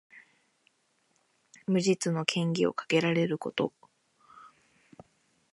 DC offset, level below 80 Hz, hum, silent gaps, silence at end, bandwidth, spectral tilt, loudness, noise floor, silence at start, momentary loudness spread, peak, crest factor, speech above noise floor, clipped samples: under 0.1%; -76 dBFS; none; none; 1.05 s; 11.5 kHz; -5 dB/octave; -29 LUFS; -72 dBFS; 0.15 s; 6 LU; -8 dBFS; 24 dB; 44 dB; under 0.1%